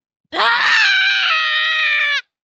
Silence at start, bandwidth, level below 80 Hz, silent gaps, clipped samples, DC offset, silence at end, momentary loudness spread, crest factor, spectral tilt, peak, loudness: 0.3 s; 8.6 kHz; -70 dBFS; none; under 0.1%; under 0.1%; 0.2 s; 6 LU; 14 dB; 1.5 dB/octave; -2 dBFS; -13 LUFS